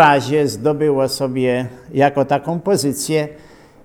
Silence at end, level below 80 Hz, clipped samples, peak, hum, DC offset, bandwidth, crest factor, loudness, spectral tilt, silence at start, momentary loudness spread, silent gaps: 0.5 s; -54 dBFS; under 0.1%; 0 dBFS; none; under 0.1%; 18.5 kHz; 16 dB; -17 LUFS; -5 dB/octave; 0 s; 5 LU; none